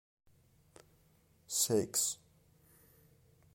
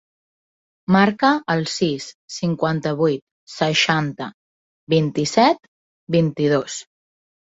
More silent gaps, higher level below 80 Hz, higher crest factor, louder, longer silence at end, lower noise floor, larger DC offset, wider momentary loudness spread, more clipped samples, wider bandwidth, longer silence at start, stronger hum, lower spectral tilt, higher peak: second, none vs 2.14-2.28 s, 3.22-3.47 s, 4.34-4.87 s, 5.68-6.07 s; second, -74 dBFS vs -60 dBFS; about the same, 22 dB vs 20 dB; second, -33 LUFS vs -20 LUFS; first, 1.4 s vs 0.75 s; second, -69 dBFS vs under -90 dBFS; neither; second, 8 LU vs 15 LU; neither; first, 16.5 kHz vs 8 kHz; first, 1.5 s vs 0.9 s; neither; second, -3 dB/octave vs -5 dB/octave; second, -18 dBFS vs -2 dBFS